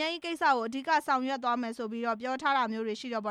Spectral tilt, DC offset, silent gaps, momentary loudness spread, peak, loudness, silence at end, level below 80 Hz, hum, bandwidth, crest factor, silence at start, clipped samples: -3.5 dB/octave; under 0.1%; none; 7 LU; -14 dBFS; -30 LUFS; 0 s; -78 dBFS; none; 14.5 kHz; 16 dB; 0 s; under 0.1%